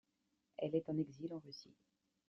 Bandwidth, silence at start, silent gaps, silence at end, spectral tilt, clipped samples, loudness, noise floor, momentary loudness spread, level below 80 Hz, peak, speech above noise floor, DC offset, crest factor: 6.2 kHz; 0.6 s; none; 0.65 s; -7.5 dB/octave; under 0.1%; -43 LUFS; -85 dBFS; 16 LU; -84 dBFS; -26 dBFS; 42 dB; under 0.1%; 20 dB